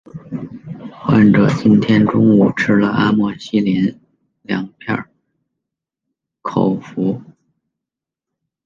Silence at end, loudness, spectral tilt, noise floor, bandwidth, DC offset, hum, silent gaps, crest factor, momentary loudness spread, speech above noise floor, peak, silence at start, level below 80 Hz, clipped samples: 1.45 s; -15 LUFS; -8 dB/octave; -85 dBFS; 7.2 kHz; under 0.1%; none; none; 14 dB; 17 LU; 71 dB; -2 dBFS; 0.15 s; -50 dBFS; under 0.1%